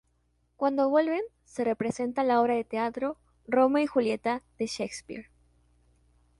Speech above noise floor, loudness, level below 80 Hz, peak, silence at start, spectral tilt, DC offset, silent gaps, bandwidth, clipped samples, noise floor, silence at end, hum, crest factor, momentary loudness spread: 44 dB; -28 LUFS; -66 dBFS; -12 dBFS; 0.6 s; -5 dB/octave; under 0.1%; none; 11.5 kHz; under 0.1%; -71 dBFS; 1.15 s; none; 18 dB; 12 LU